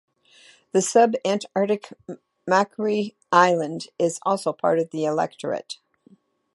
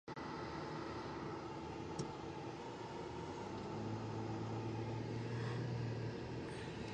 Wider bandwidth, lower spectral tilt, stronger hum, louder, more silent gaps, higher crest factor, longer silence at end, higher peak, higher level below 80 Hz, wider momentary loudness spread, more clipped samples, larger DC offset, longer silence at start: first, 11.5 kHz vs 9.8 kHz; second, -4.5 dB/octave vs -6.5 dB/octave; neither; first, -23 LUFS vs -45 LUFS; neither; first, 22 dB vs 14 dB; first, 0.8 s vs 0 s; first, -2 dBFS vs -30 dBFS; second, -76 dBFS vs -62 dBFS; first, 17 LU vs 5 LU; neither; neither; first, 0.75 s vs 0.05 s